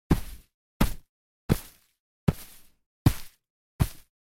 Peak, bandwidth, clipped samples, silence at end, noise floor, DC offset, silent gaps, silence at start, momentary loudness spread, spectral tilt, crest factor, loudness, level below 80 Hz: -6 dBFS; 17 kHz; under 0.1%; 0.35 s; -48 dBFS; under 0.1%; 0.54-0.80 s, 1.09-1.49 s, 2.00-2.27 s, 2.86-3.05 s, 3.50-3.79 s; 0.1 s; 21 LU; -6.5 dB/octave; 24 dB; -30 LUFS; -38 dBFS